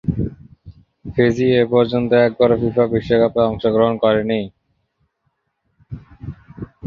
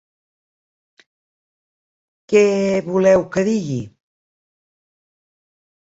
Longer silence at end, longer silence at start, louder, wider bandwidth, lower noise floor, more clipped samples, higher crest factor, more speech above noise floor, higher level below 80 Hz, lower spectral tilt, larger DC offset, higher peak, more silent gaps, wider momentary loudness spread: second, 0 s vs 2 s; second, 0.05 s vs 2.3 s; about the same, -17 LUFS vs -17 LUFS; second, 6.8 kHz vs 8 kHz; second, -70 dBFS vs under -90 dBFS; neither; about the same, 18 dB vs 20 dB; second, 54 dB vs over 74 dB; first, -42 dBFS vs -58 dBFS; first, -8 dB/octave vs -6.5 dB/octave; neither; about the same, -2 dBFS vs -2 dBFS; neither; first, 21 LU vs 12 LU